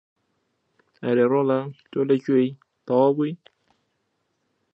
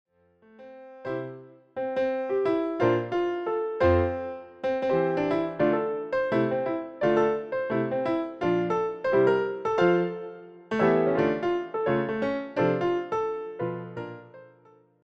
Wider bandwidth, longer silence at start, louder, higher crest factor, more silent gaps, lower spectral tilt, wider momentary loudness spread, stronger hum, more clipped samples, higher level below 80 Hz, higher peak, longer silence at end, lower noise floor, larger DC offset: about the same, 6 kHz vs 6.6 kHz; first, 1 s vs 0.6 s; first, -22 LUFS vs -27 LUFS; about the same, 18 dB vs 18 dB; neither; first, -9.5 dB/octave vs -8 dB/octave; about the same, 12 LU vs 14 LU; neither; neither; second, -76 dBFS vs -54 dBFS; first, -6 dBFS vs -10 dBFS; first, 1.4 s vs 0.6 s; first, -74 dBFS vs -59 dBFS; neither